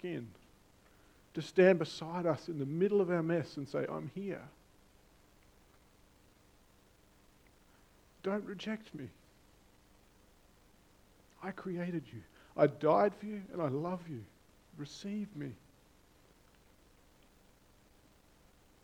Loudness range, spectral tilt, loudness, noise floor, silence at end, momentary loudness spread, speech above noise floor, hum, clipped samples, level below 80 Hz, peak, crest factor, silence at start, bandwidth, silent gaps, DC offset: 16 LU; -7 dB/octave; -35 LUFS; -65 dBFS; 3.3 s; 20 LU; 31 dB; none; under 0.1%; -70 dBFS; -12 dBFS; 26 dB; 0.05 s; 16 kHz; none; under 0.1%